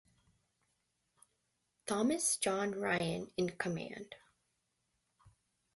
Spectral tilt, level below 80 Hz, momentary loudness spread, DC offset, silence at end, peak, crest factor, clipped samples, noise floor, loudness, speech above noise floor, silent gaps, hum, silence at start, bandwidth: -3.5 dB/octave; -72 dBFS; 17 LU; under 0.1%; 0.45 s; -18 dBFS; 22 dB; under 0.1%; -83 dBFS; -36 LUFS; 47 dB; none; none; 1.85 s; 12 kHz